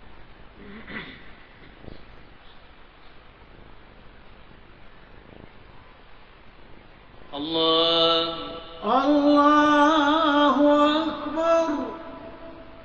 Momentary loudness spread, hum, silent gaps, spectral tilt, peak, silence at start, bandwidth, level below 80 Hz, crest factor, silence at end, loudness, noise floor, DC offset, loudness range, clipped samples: 24 LU; none; none; -4.5 dB/octave; -8 dBFS; 0 s; 7.4 kHz; -52 dBFS; 16 dB; 0 s; -20 LUFS; -47 dBFS; under 0.1%; 24 LU; under 0.1%